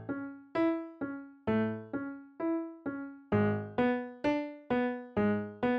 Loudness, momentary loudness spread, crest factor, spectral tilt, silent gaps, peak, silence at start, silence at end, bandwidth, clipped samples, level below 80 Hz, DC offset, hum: -34 LUFS; 9 LU; 16 dB; -9 dB/octave; none; -18 dBFS; 0 s; 0 s; 6.2 kHz; under 0.1%; -64 dBFS; under 0.1%; none